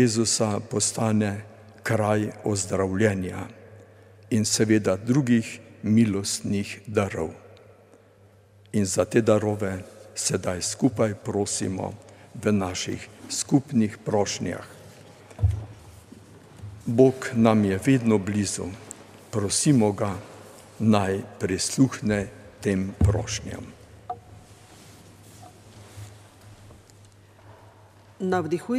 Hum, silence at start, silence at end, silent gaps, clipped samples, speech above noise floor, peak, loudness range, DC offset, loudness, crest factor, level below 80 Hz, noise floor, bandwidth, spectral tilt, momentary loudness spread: none; 0 s; 0 s; none; under 0.1%; 31 dB; -4 dBFS; 7 LU; under 0.1%; -24 LUFS; 22 dB; -46 dBFS; -55 dBFS; 15.5 kHz; -5 dB/octave; 18 LU